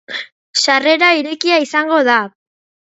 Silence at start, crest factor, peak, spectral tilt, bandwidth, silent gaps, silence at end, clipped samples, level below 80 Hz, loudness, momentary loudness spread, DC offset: 0.1 s; 16 dB; 0 dBFS; -1.5 dB/octave; 8.2 kHz; 0.32-0.53 s; 0.6 s; under 0.1%; -72 dBFS; -13 LUFS; 14 LU; under 0.1%